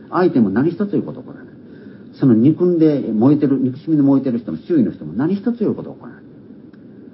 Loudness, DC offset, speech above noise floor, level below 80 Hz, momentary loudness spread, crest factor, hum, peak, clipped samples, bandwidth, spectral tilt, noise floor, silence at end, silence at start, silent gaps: -17 LUFS; under 0.1%; 24 dB; -58 dBFS; 13 LU; 14 dB; none; -2 dBFS; under 0.1%; 5.8 kHz; -13.5 dB/octave; -40 dBFS; 0.1 s; 0 s; none